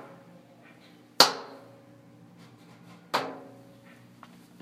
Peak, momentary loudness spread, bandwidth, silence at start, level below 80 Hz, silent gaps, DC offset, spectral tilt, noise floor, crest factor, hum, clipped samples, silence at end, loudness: 0 dBFS; 29 LU; 16 kHz; 0.05 s; -80 dBFS; none; under 0.1%; -1 dB/octave; -54 dBFS; 34 dB; none; under 0.1%; 1.2 s; -25 LUFS